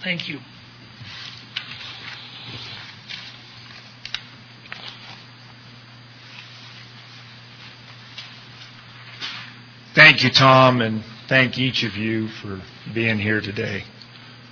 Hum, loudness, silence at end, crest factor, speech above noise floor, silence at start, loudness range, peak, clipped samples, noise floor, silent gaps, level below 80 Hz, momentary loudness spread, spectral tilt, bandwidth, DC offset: none; -18 LUFS; 0.15 s; 24 dB; 24 dB; 0 s; 24 LU; 0 dBFS; under 0.1%; -44 dBFS; none; -62 dBFS; 27 LU; -5 dB/octave; 5.4 kHz; under 0.1%